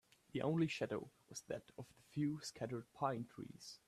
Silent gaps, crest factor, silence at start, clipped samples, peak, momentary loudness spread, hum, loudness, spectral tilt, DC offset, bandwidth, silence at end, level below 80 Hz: none; 18 dB; 0.35 s; under 0.1%; -26 dBFS; 14 LU; none; -44 LUFS; -6 dB/octave; under 0.1%; 14 kHz; 0.1 s; -76 dBFS